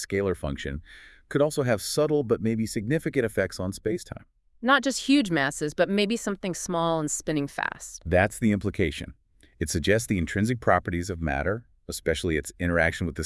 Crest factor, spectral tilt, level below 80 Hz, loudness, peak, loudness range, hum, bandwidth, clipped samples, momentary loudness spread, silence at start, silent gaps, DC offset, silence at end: 22 dB; -5 dB/octave; -46 dBFS; -26 LUFS; -6 dBFS; 2 LU; none; 12 kHz; under 0.1%; 9 LU; 0 s; none; under 0.1%; 0 s